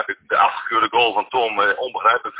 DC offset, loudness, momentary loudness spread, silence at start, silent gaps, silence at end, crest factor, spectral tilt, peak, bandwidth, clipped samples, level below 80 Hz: under 0.1%; -18 LUFS; 4 LU; 0 s; none; 0 s; 16 dB; -6 dB/octave; -2 dBFS; 4 kHz; under 0.1%; -62 dBFS